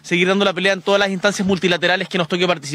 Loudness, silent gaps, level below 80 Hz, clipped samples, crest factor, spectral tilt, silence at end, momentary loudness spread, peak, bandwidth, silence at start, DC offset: -17 LUFS; none; -58 dBFS; under 0.1%; 16 dB; -4.5 dB/octave; 0 s; 3 LU; -2 dBFS; 13.5 kHz; 0.05 s; under 0.1%